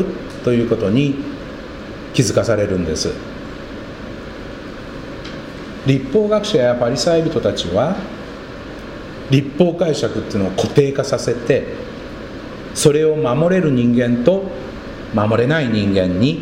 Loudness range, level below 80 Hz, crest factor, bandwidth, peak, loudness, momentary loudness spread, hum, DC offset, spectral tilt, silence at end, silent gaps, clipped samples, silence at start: 5 LU; -40 dBFS; 18 dB; 16 kHz; 0 dBFS; -17 LUFS; 16 LU; none; under 0.1%; -6 dB/octave; 0 s; none; under 0.1%; 0 s